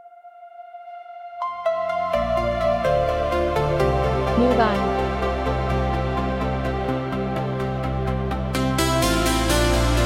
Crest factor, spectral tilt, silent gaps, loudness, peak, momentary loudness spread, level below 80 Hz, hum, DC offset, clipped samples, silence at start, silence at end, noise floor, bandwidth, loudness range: 18 dB; -5.5 dB/octave; none; -22 LUFS; -4 dBFS; 9 LU; -30 dBFS; none; under 0.1%; under 0.1%; 0.05 s; 0 s; -44 dBFS; 16.5 kHz; 3 LU